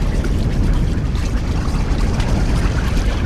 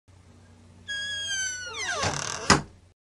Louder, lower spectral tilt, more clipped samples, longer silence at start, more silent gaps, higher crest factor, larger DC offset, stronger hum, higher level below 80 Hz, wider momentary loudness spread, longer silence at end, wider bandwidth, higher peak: first, -20 LUFS vs -27 LUFS; first, -6.5 dB/octave vs -2 dB/octave; neither; second, 0 s vs 0.3 s; neither; second, 12 dB vs 26 dB; neither; neither; first, -18 dBFS vs -50 dBFS; second, 2 LU vs 12 LU; second, 0 s vs 0.35 s; second, 12.5 kHz vs 15 kHz; about the same, -4 dBFS vs -4 dBFS